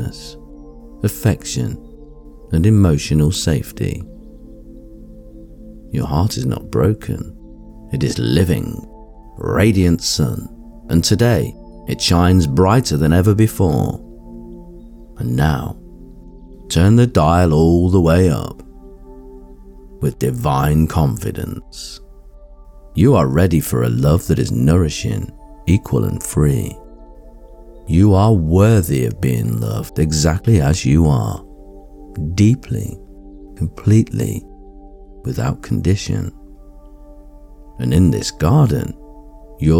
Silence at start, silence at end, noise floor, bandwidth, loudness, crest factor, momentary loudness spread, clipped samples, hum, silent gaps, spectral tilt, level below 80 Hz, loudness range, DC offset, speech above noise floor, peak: 0 s; 0 s; -39 dBFS; 18.5 kHz; -16 LUFS; 14 dB; 17 LU; under 0.1%; none; none; -6.5 dB/octave; -32 dBFS; 7 LU; under 0.1%; 24 dB; -2 dBFS